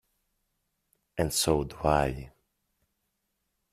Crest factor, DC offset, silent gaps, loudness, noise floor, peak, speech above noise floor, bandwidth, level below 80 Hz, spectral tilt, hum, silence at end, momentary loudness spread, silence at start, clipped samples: 24 dB; under 0.1%; none; -28 LUFS; -80 dBFS; -8 dBFS; 52 dB; 15.5 kHz; -46 dBFS; -4 dB/octave; none; 1.45 s; 13 LU; 1.15 s; under 0.1%